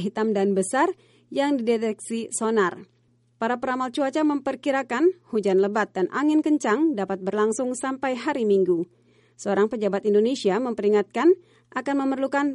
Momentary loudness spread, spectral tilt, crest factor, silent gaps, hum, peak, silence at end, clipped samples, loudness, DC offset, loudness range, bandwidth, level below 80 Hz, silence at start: 6 LU; -5 dB/octave; 14 dB; none; none; -10 dBFS; 0 s; under 0.1%; -24 LUFS; under 0.1%; 3 LU; 11.5 kHz; -72 dBFS; 0 s